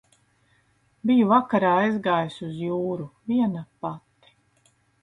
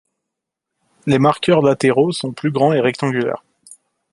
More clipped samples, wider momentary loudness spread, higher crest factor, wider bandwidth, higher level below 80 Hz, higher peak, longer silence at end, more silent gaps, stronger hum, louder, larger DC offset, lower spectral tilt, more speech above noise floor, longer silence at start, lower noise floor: neither; first, 15 LU vs 8 LU; about the same, 20 dB vs 16 dB; second, 9.2 kHz vs 11.5 kHz; second, -66 dBFS vs -58 dBFS; second, -6 dBFS vs -2 dBFS; first, 1.05 s vs 0.75 s; neither; neither; second, -24 LUFS vs -16 LUFS; neither; first, -8 dB/octave vs -6.5 dB/octave; second, 42 dB vs 65 dB; about the same, 1.05 s vs 1.05 s; second, -65 dBFS vs -81 dBFS